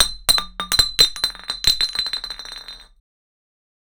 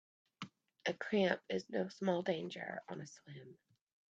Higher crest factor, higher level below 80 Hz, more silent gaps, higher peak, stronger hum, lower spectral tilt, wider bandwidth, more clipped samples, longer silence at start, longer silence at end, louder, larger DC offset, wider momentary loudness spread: about the same, 22 dB vs 22 dB; first, -40 dBFS vs -82 dBFS; neither; first, -2 dBFS vs -18 dBFS; neither; second, 0.5 dB/octave vs -5.5 dB/octave; first, over 20 kHz vs 8 kHz; neither; second, 0 s vs 0.4 s; first, 1.15 s vs 0.55 s; first, -17 LUFS vs -39 LUFS; neither; about the same, 17 LU vs 18 LU